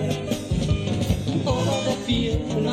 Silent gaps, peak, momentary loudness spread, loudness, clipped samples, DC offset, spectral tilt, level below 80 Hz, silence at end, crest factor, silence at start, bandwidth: none; -8 dBFS; 3 LU; -24 LUFS; under 0.1%; under 0.1%; -6 dB/octave; -34 dBFS; 0 s; 14 dB; 0 s; 16 kHz